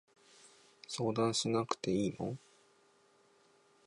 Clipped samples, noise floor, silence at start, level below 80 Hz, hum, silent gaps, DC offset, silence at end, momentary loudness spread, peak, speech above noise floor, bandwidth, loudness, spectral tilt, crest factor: under 0.1%; -69 dBFS; 0.45 s; -70 dBFS; none; none; under 0.1%; 1.5 s; 13 LU; -16 dBFS; 34 dB; 11.5 kHz; -35 LUFS; -5 dB/octave; 22 dB